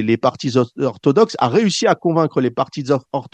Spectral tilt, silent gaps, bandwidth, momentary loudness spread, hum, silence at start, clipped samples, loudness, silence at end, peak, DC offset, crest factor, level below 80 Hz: -6 dB/octave; none; 9.4 kHz; 5 LU; none; 0 s; under 0.1%; -17 LUFS; 0.1 s; 0 dBFS; under 0.1%; 16 dB; -62 dBFS